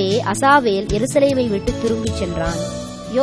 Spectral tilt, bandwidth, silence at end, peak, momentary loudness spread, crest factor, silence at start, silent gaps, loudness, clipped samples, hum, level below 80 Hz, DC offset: -5 dB/octave; 11 kHz; 0 s; -2 dBFS; 10 LU; 16 dB; 0 s; none; -18 LUFS; under 0.1%; none; -34 dBFS; 0.1%